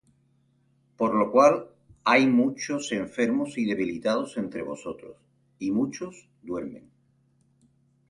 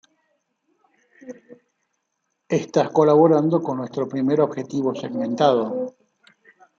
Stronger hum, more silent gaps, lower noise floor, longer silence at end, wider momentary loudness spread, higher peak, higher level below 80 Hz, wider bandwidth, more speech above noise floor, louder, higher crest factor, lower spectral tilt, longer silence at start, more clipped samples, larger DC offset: neither; neither; second, -66 dBFS vs -75 dBFS; first, 1.3 s vs 0.9 s; first, 18 LU vs 15 LU; about the same, -6 dBFS vs -4 dBFS; about the same, -66 dBFS vs -70 dBFS; first, 11.5 kHz vs 7.4 kHz; second, 41 dB vs 56 dB; second, -25 LUFS vs -20 LUFS; about the same, 22 dB vs 20 dB; second, -5 dB/octave vs -7 dB/octave; second, 1 s vs 1.25 s; neither; neither